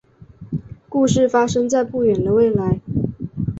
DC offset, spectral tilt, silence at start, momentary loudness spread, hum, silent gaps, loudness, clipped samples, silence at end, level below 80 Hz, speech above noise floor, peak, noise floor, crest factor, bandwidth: under 0.1%; -6.5 dB/octave; 0.2 s; 13 LU; none; none; -18 LUFS; under 0.1%; 0 s; -42 dBFS; 25 dB; -4 dBFS; -42 dBFS; 16 dB; 8 kHz